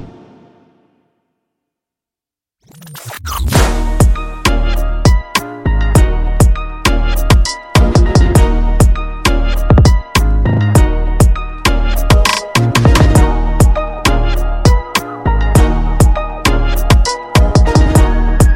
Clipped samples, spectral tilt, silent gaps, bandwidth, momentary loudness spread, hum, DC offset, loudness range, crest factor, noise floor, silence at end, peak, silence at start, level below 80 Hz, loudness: under 0.1%; -5.5 dB/octave; none; 17 kHz; 7 LU; none; under 0.1%; 5 LU; 10 dB; -88 dBFS; 0 s; 0 dBFS; 0 s; -14 dBFS; -12 LUFS